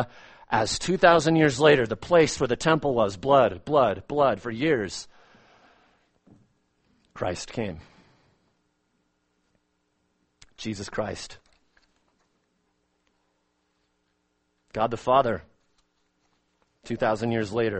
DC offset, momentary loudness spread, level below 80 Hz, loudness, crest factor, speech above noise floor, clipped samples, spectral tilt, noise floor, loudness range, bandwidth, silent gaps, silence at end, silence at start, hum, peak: under 0.1%; 16 LU; -54 dBFS; -24 LUFS; 22 dB; 50 dB; under 0.1%; -5 dB/octave; -73 dBFS; 18 LU; 8.8 kHz; none; 0 s; 0 s; none; -4 dBFS